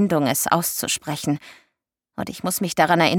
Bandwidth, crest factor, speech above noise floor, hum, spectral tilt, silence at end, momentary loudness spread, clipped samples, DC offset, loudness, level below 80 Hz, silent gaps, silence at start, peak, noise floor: 19 kHz; 20 dB; 56 dB; none; -4 dB/octave; 0 s; 12 LU; under 0.1%; under 0.1%; -22 LUFS; -60 dBFS; none; 0 s; -2 dBFS; -77 dBFS